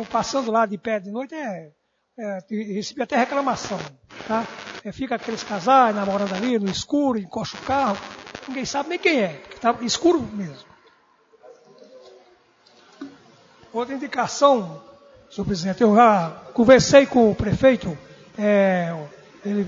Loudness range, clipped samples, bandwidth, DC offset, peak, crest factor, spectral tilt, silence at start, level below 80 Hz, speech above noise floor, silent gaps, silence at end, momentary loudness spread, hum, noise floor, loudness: 10 LU; under 0.1%; 7.8 kHz; under 0.1%; 0 dBFS; 22 dB; -5 dB/octave; 0 s; -52 dBFS; 37 dB; none; 0 s; 19 LU; none; -58 dBFS; -21 LUFS